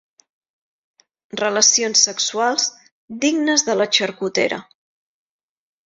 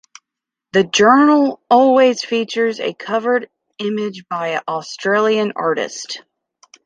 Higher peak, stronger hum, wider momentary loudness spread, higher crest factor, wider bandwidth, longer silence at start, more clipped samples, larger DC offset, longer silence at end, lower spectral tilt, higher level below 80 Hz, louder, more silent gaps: about the same, -2 dBFS vs -2 dBFS; neither; second, 10 LU vs 13 LU; about the same, 20 dB vs 16 dB; second, 7.8 kHz vs 9.4 kHz; first, 1.35 s vs 0.75 s; neither; neither; first, 1.25 s vs 0.65 s; second, -1 dB/octave vs -4 dB/octave; about the same, -68 dBFS vs -64 dBFS; about the same, -17 LUFS vs -16 LUFS; first, 2.92-3.08 s vs none